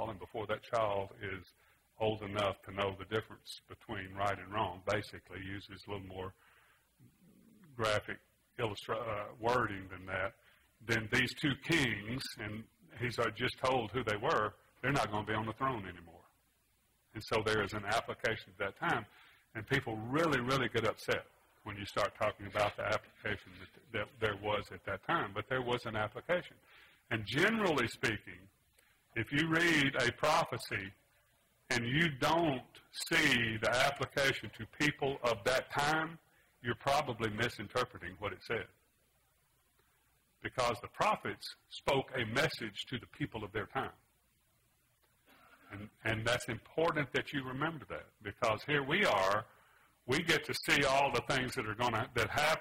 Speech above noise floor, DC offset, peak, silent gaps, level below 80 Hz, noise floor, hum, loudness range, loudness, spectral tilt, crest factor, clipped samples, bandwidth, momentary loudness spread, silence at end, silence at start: 39 dB; under 0.1%; -14 dBFS; none; -62 dBFS; -75 dBFS; none; 8 LU; -35 LUFS; -4.5 dB/octave; 22 dB; under 0.1%; 16 kHz; 15 LU; 0 s; 0 s